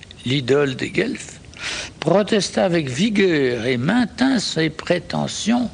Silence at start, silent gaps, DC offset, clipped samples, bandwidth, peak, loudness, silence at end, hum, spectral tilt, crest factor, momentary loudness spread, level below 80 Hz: 0 s; none; under 0.1%; under 0.1%; 10 kHz; -2 dBFS; -20 LUFS; 0 s; none; -5 dB/octave; 16 dB; 9 LU; -50 dBFS